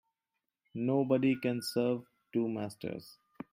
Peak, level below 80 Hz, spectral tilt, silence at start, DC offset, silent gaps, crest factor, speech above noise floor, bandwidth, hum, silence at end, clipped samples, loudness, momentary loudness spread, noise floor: -16 dBFS; -76 dBFS; -6.5 dB/octave; 0.75 s; under 0.1%; none; 18 dB; 56 dB; 16 kHz; none; 0.4 s; under 0.1%; -33 LUFS; 15 LU; -88 dBFS